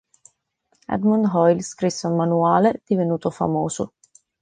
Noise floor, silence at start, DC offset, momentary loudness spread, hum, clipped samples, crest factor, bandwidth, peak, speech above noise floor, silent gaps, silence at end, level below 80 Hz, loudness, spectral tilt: -68 dBFS; 0.9 s; under 0.1%; 9 LU; none; under 0.1%; 18 dB; 9.8 kHz; -4 dBFS; 49 dB; none; 0.55 s; -58 dBFS; -21 LUFS; -6.5 dB/octave